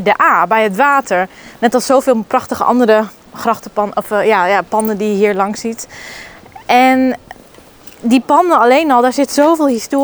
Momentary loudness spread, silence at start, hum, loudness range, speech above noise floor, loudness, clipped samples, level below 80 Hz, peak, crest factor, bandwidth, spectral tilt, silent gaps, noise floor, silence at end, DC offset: 13 LU; 0 s; none; 3 LU; 28 dB; -13 LUFS; under 0.1%; -52 dBFS; 0 dBFS; 12 dB; over 20 kHz; -4.5 dB/octave; none; -41 dBFS; 0 s; under 0.1%